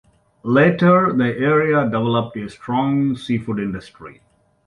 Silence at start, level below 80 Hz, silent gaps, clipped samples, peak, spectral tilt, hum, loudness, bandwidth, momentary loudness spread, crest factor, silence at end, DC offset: 0.45 s; -54 dBFS; none; under 0.1%; -2 dBFS; -8.5 dB/octave; none; -18 LUFS; 11 kHz; 14 LU; 16 dB; 0.55 s; under 0.1%